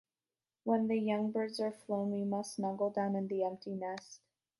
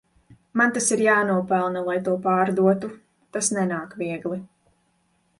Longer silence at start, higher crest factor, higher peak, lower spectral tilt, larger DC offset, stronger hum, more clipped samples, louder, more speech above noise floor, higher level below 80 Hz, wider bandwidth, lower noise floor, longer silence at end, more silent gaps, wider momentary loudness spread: about the same, 0.65 s vs 0.55 s; about the same, 18 dB vs 16 dB; second, -18 dBFS vs -6 dBFS; first, -6.5 dB/octave vs -4.5 dB/octave; neither; neither; neither; second, -36 LUFS vs -23 LUFS; first, over 55 dB vs 45 dB; second, -84 dBFS vs -66 dBFS; about the same, 11.5 kHz vs 11.5 kHz; first, under -90 dBFS vs -67 dBFS; second, 0.45 s vs 0.95 s; neither; about the same, 9 LU vs 11 LU